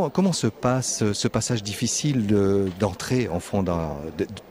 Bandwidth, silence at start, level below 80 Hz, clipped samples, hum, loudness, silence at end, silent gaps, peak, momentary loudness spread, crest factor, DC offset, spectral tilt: 16 kHz; 0 s; -48 dBFS; under 0.1%; none; -24 LUFS; 0 s; none; -8 dBFS; 7 LU; 16 dB; under 0.1%; -5 dB/octave